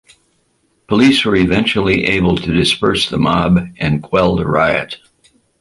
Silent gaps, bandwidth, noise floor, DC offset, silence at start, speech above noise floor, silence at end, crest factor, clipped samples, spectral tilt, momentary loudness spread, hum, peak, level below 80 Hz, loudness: none; 11.5 kHz; -61 dBFS; under 0.1%; 0.9 s; 47 dB; 0.65 s; 14 dB; under 0.1%; -5.5 dB/octave; 7 LU; none; -2 dBFS; -36 dBFS; -14 LUFS